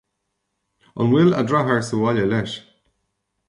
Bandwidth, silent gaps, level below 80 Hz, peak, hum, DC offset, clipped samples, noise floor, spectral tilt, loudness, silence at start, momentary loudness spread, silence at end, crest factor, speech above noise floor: 11.5 kHz; none; -56 dBFS; -6 dBFS; none; under 0.1%; under 0.1%; -76 dBFS; -7 dB/octave; -19 LUFS; 0.95 s; 15 LU; 0.9 s; 16 dB; 57 dB